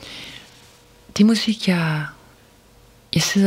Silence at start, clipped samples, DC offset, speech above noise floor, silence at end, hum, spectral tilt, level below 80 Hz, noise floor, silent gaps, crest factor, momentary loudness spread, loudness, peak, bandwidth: 0 s; under 0.1%; under 0.1%; 33 dB; 0 s; none; -4.5 dB/octave; -54 dBFS; -51 dBFS; none; 18 dB; 19 LU; -20 LUFS; -4 dBFS; 16 kHz